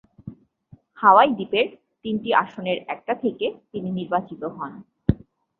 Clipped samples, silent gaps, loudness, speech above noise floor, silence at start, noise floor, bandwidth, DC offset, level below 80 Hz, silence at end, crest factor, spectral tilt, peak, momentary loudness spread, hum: under 0.1%; none; -22 LUFS; 31 dB; 0.25 s; -53 dBFS; 4.4 kHz; under 0.1%; -48 dBFS; 0.45 s; 22 dB; -9 dB/octave; -2 dBFS; 19 LU; none